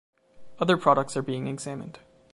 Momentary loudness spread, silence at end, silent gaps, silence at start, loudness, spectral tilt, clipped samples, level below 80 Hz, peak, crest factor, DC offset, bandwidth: 16 LU; 0.35 s; none; 0.35 s; -26 LUFS; -5.5 dB/octave; under 0.1%; -66 dBFS; -6 dBFS; 22 dB; under 0.1%; 11.5 kHz